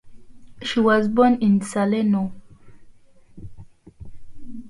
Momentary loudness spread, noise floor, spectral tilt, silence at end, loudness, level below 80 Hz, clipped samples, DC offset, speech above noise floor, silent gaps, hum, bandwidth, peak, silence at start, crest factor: 14 LU; -47 dBFS; -6.5 dB/octave; 0 s; -20 LUFS; -50 dBFS; under 0.1%; under 0.1%; 29 dB; none; none; 11.5 kHz; -6 dBFS; 0.05 s; 16 dB